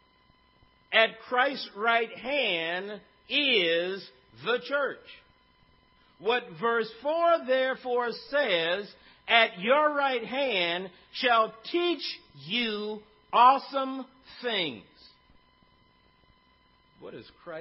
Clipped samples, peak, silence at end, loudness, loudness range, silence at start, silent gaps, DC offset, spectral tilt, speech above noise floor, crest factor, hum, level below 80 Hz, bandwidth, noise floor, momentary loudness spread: under 0.1%; -6 dBFS; 0 s; -27 LUFS; 6 LU; 0.9 s; none; under 0.1%; -7 dB/octave; 36 dB; 24 dB; none; -72 dBFS; 5.8 kHz; -64 dBFS; 18 LU